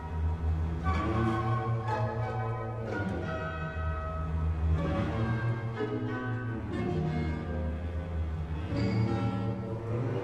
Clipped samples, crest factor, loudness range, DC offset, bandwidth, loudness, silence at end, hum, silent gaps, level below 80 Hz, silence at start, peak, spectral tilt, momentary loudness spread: under 0.1%; 14 dB; 2 LU; under 0.1%; 8.2 kHz; -33 LUFS; 0 s; none; none; -38 dBFS; 0 s; -18 dBFS; -8.5 dB/octave; 6 LU